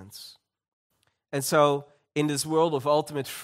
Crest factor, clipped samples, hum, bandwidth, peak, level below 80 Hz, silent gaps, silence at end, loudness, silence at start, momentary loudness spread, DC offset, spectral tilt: 20 dB; under 0.1%; none; 16 kHz; -8 dBFS; -72 dBFS; 0.68-0.90 s; 0 s; -26 LUFS; 0 s; 18 LU; under 0.1%; -4.5 dB/octave